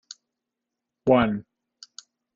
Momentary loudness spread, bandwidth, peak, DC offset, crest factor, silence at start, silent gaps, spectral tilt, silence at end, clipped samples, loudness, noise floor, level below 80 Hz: 25 LU; 7.6 kHz; -6 dBFS; under 0.1%; 22 dB; 1.05 s; none; -5.5 dB/octave; 0.95 s; under 0.1%; -23 LUFS; -85 dBFS; -56 dBFS